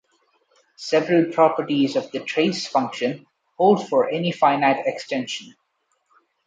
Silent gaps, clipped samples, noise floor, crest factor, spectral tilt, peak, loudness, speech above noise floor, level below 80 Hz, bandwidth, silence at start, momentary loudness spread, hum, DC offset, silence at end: none; under 0.1%; -71 dBFS; 18 dB; -5.5 dB/octave; -4 dBFS; -21 LUFS; 50 dB; -72 dBFS; 9.2 kHz; 0.8 s; 9 LU; none; under 0.1%; 0.95 s